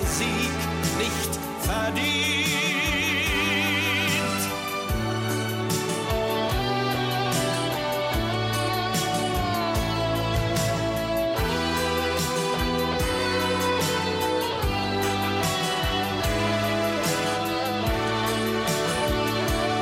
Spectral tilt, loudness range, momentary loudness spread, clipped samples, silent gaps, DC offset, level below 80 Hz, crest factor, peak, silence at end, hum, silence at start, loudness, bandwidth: -4 dB/octave; 2 LU; 4 LU; under 0.1%; none; under 0.1%; -38 dBFS; 14 dB; -12 dBFS; 0 s; none; 0 s; -24 LUFS; 16.5 kHz